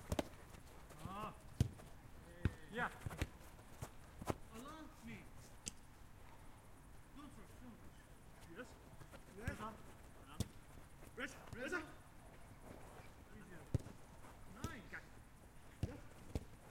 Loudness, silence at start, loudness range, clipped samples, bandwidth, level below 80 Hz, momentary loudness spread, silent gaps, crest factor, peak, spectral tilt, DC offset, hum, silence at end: -51 LUFS; 0 s; 10 LU; under 0.1%; 16.5 kHz; -60 dBFS; 16 LU; none; 30 dB; -20 dBFS; -5.5 dB/octave; under 0.1%; none; 0 s